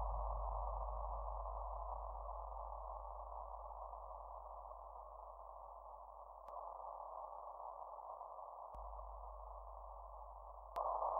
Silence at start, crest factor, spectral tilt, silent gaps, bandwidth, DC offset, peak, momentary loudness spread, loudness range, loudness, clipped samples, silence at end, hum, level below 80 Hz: 0 s; 20 dB; -8 dB/octave; none; 3.6 kHz; under 0.1%; -28 dBFS; 10 LU; 6 LU; -50 LUFS; under 0.1%; 0 s; none; -52 dBFS